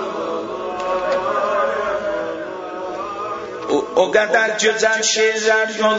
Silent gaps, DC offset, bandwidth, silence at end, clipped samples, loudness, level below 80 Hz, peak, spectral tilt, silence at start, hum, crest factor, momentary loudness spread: none; under 0.1%; 8 kHz; 0 s; under 0.1%; -19 LUFS; -56 dBFS; -2 dBFS; -1.5 dB/octave; 0 s; none; 18 dB; 11 LU